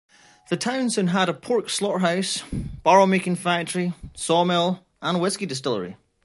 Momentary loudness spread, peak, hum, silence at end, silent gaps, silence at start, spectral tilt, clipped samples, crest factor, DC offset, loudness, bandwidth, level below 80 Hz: 11 LU; -4 dBFS; none; 0.3 s; none; 0.5 s; -4.5 dB/octave; under 0.1%; 20 dB; under 0.1%; -23 LUFS; 11.5 kHz; -48 dBFS